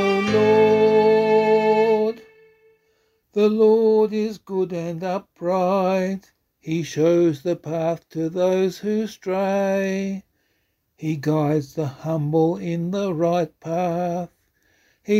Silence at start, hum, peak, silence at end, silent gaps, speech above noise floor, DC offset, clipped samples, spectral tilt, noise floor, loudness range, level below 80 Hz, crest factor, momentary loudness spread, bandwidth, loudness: 0 s; none; -6 dBFS; 0 s; none; 48 dB; under 0.1%; under 0.1%; -7 dB/octave; -70 dBFS; 5 LU; -62 dBFS; 16 dB; 12 LU; 14 kHz; -21 LUFS